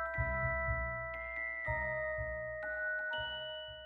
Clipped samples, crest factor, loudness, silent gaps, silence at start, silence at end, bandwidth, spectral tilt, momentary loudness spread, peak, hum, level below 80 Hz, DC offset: under 0.1%; 16 dB; -37 LUFS; none; 0 s; 0 s; 4.6 kHz; -7 dB/octave; 6 LU; -22 dBFS; none; -48 dBFS; under 0.1%